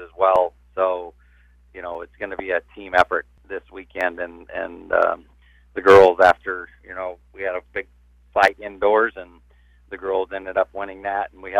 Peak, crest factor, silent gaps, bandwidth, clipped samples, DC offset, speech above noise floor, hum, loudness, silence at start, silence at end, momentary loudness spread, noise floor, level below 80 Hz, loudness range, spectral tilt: -4 dBFS; 18 dB; none; 11.5 kHz; under 0.1%; under 0.1%; 34 dB; 60 Hz at -60 dBFS; -20 LUFS; 0 s; 0 s; 18 LU; -53 dBFS; -52 dBFS; 7 LU; -5 dB/octave